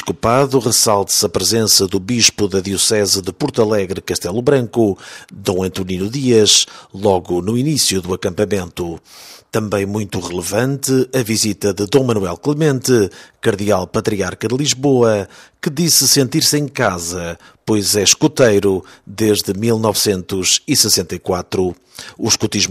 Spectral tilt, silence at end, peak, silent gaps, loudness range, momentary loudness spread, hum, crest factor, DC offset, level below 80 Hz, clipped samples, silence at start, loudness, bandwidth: -3.5 dB/octave; 0 s; 0 dBFS; none; 5 LU; 10 LU; none; 16 dB; under 0.1%; -48 dBFS; under 0.1%; 0 s; -15 LUFS; 16 kHz